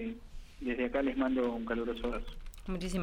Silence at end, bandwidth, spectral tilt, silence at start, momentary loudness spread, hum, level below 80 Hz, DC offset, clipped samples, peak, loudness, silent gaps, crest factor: 0 s; 16 kHz; -6 dB/octave; 0 s; 17 LU; none; -46 dBFS; under 0.1%; under 0.1%; -20 dBFS; -35 LUFS; none; 14 dB